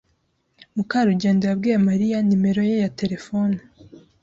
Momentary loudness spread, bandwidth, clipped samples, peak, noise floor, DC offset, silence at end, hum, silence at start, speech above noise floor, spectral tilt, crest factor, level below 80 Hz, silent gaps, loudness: 8 LU; 7.6 kHz; under 0.1%; -8 dBFS; -68 dBFS; under 0.1%; 0.65 s; none; 0.75 s; 48 dB; -7.5 dB/octave; 14 dB; -58 dBFS; none; -21 LUFS